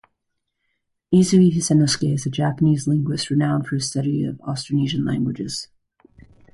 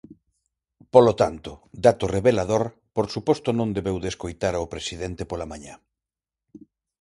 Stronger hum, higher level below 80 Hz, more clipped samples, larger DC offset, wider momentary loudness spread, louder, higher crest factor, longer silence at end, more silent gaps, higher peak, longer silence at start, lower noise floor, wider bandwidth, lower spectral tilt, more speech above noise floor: neither; second, -52 dBFS vs -46 dBFS; neither; neither; second, 11 LU vs 14 LU; first, -20 LUFS vs -23 LUFS; second, 16 dB vs 24 dB; second, 0.9 s vs 1.25 s; neither; second, -6 dBFS vs 0 dBFS; first, 1.1 s vs 0.1 s; second, -76 dBFS vs -90 dBFS; about the same, 11.5 kHz vs 11.5 kHz; about the same, -6 dB/octave vs -6 dB/octave; second, 57 dB vs 67 dB